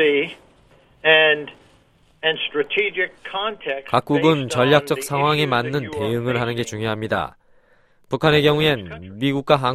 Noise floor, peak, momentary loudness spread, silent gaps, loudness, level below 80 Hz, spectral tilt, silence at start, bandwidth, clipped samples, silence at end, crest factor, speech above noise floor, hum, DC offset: -56 dBFS; 0 dBFS; 10 LU; none; -20 LUFS; -52 dBFS; -5 dB/octave; 0 s; 15 kHz; under 0.1%; 0 s; 20 dB; 36 dB; none; under 0.1%